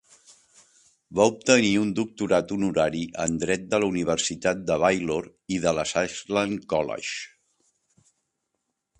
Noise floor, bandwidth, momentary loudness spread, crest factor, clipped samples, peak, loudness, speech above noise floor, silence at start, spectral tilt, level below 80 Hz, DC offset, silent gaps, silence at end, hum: -80 dBFS; 10.5 kHz; 10 LU; 22 dB; under 0.1%; -4 dBFS; -25 LUFS; 55 dB; 1.1 s; -4 dB/octave; -56 dBFS; under 0.1%; none; 1.75 s; none